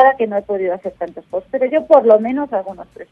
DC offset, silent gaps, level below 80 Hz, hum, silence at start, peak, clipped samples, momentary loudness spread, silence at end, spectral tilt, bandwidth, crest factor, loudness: under 0.1%; none; -56 dBFS; none; 0 s; 0 dBFS; under 0.1%; 16 LU; 0.1 s; -8 dB/octave; 4.7 kHz; 16 dB; -16 LUFS